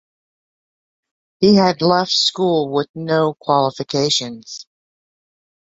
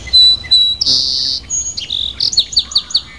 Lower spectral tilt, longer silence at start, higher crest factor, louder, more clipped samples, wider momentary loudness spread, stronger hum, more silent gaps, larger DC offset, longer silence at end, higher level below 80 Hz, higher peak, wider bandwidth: first, -4.5 dB/octave vs 0.5 dB/octave; first, 1.4 s vs 0 s; first, 18 dB vs 12 dB; second, -16 LUFS vs -11 LUFS; neither; about the same, 13 LU vs 11 LU; neither; first, 2.89-2.94 s vs none; second, under 0.1% vs 0.5%; first, 1.15 s vs 0 s; second, -60 dBFS vs -38 dBFS; about the same, -2 dBFS vs -2 dBFS; second, 8 kHz vs 11 kHz